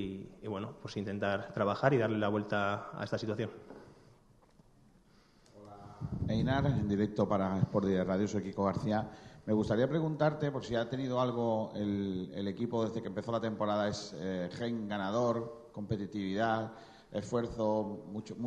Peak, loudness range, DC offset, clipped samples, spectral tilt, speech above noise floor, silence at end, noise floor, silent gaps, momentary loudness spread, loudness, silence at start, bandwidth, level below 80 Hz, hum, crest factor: -12 dBFS; 6 LU; under 0.1%; under 0.1%; -7 dB/octave; 30 dB; 0 s; -64 dBFS; none; 12 LU; -34 LUFS; 0 s; 9.4 kHz; -58 dBFS; none; 22 dB